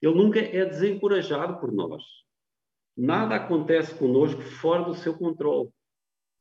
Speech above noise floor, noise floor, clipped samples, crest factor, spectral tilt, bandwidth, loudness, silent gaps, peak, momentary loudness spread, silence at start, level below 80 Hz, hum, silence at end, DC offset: 66 dB; -90 dBFS; under 0.1%; 18 dB; -7.5 dB/octave; 7.4 kHz; -25 LUFS; none; -8 dBFS; 8 LU; 0 s; -76 dBFS; none; 0.75 s; under 0.1%